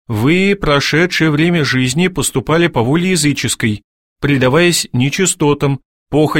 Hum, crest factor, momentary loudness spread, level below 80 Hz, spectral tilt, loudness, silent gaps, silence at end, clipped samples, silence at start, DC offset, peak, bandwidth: none; 14 dB; 6 LU; -38 dBFS; -4.5 dB/octave; -13 LUFS; 3.84-4.16 s, 5.85-6.06 s; 0 s; under 0.1%; 0.1 s; 0.4%; 0 dBFS; 16.5 kHz